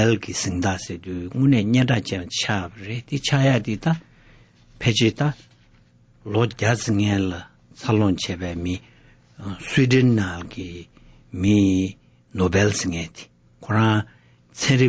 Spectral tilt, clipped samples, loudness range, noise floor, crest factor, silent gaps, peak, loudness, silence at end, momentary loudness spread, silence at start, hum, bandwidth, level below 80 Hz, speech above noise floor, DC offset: -5.5 dB/octave; under 0.1%; 2 LU; -55 dBFS; 16 dB; none; -6 dBFS; -22 LUFS; 0 s; 17 LU; 0 s; none; 8 kHz; -44 dBFS; 34 dB; under 0.1%